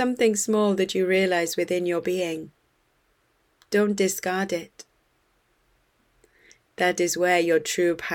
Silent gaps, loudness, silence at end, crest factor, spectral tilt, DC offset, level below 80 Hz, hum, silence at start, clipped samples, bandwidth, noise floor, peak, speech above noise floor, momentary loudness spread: none; -24 LUFS; 0 s; 18 dB; -4 dB/octave; under 0.1%; -66 dBFS; none; 0 s; under 0.1%; 18.5 kHz; -67 dBFS; -8 dBFS; 44 dB; 8 LU